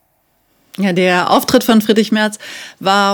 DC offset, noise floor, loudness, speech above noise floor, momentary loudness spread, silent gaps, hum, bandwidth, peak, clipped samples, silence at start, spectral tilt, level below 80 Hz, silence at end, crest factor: under 0.1%; -60 dBFS; -13 LUFS; 47 dB; 14 LU; none; none; over 20 kHz; 0 dBFS; 0.4%; 0.8 s; -4.5 dB/octave; -56 dBFS; 0 s; 14 dB